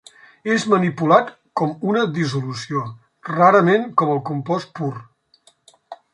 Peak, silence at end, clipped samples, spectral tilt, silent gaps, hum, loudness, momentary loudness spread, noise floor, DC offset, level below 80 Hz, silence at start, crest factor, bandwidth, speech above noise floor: -2 dBFS; 0.2 s; under 0.1%; -6.5 dB/octave; none; none; -19 LUFS; 13 LU; -57 dBFS; under 0.1%; -64 dBFS; 0.45 s; 18 dB; 11 kHz; 39 dB